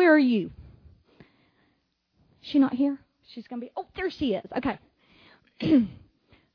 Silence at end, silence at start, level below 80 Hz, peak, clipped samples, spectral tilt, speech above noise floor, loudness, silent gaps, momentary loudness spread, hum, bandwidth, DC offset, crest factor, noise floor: 0.6 s; 0 s; -58 dBFS; -8 dBFS; under 0.1%; -8 dB/octave; 47 dB; -26 LUFS; none; 17 LU; none; 5.4 kHz; under 0.1%; 20 dB; -72 dBFS